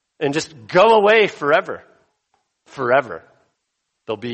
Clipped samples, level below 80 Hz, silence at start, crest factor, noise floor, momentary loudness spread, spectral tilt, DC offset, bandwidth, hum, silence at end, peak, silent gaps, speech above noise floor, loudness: under 0.1%; -64 dBFS; 0.2 s; 18 dB; -75 dBFS; 21 LU; -4.5 dB/octave; under 0.1%; 8.4 kHz; none; 0 s; -2 dBFS; none; 58 dB; -17 LUFS